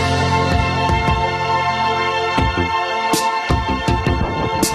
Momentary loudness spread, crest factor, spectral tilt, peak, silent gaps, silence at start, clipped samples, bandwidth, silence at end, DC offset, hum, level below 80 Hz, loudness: 2 LU; 16 dB; -4.5 dB/octave; -2 dBFS; none; 0 s; under 0.1%; 14 kHz; 0 s; under 0.1%; none; -28 dBFS; -17 LUFS